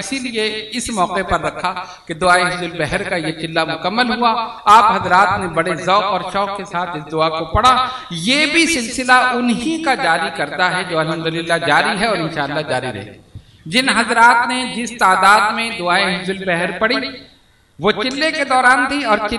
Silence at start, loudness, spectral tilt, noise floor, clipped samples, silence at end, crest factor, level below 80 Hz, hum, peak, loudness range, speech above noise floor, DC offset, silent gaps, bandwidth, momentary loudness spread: 0 s; -15 LUFS; -3.5 dB/octave; -51 dBFS; under 0.1%; 0 s; 16 dB; -42 dBFS; none; 0 dBFS; 4 LU; 35 dB; under 0.1%; none; 12 kHz; 10 LU